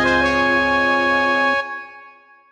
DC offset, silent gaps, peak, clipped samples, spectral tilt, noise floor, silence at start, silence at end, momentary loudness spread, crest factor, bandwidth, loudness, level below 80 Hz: under 0.1%; none; -4 dBFS; under 0.1%; -4 dB/octave; -46 dBFS; 0 s; 0.4 s; 14 LU; 16 dB; 10.5 kHz; -16 LUFS; -44 dBFS